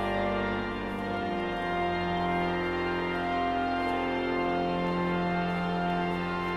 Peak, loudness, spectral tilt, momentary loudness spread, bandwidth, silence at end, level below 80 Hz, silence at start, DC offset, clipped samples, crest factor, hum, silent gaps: -16 dBFS; -30 LUFS; -7 dB/octave; 3 LU; 11 kHz; 0 s; -48 dBFS; 0 s; under 0.1%; under 0.1%; 12 dB; none; none